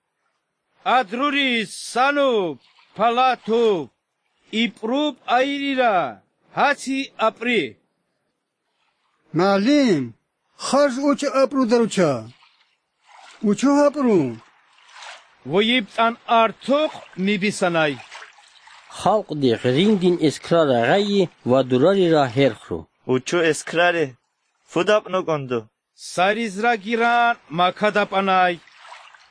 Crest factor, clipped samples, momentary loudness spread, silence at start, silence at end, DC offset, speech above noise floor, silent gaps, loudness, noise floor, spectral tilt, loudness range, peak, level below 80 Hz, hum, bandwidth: 18 dB; under 0.1%; 12 LU; 0.85 s; 0.35 s; under 0.1%; 55 dB; none; -20 LUFS; -74 dBFS; -5 dB/octave; 4 LU; -2 dBFS; -66 dBFS; none; 10.5 kHz